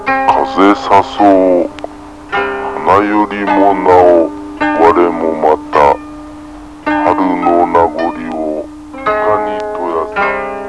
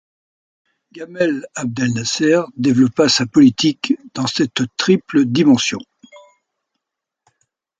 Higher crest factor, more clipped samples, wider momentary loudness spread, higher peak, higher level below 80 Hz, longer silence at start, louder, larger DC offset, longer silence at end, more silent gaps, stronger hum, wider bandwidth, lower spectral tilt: about the same, 12 dB vs 16 dB; first, 0.7% vs under 0.1%; first, 14 LU vs 9 LU; about the same, 0 dBFS vs -2 dBFS; first, -40 dBFS vs -58 dBFS; second, 0 s vs 0.95 s; first, -11 LUFS vs -16 LUFS; first, 0.4% vs under 0.1%; second, 0 s vs 1.6 s; neither; neither; first, 11 kHz vs 9.2 kHz; first, -6 dB/octave vs -4.5 dB/octave